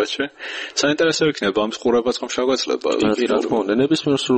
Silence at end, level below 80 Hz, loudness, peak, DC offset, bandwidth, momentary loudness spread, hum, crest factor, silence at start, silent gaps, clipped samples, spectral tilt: 0 s; -56 dBFS; -20 LUFS; -6 dBFS; under 0.1%; 8.8 kHz; 5 LU; none; 14 dB; 0 s; none; under 0.1%; -4 dB/octave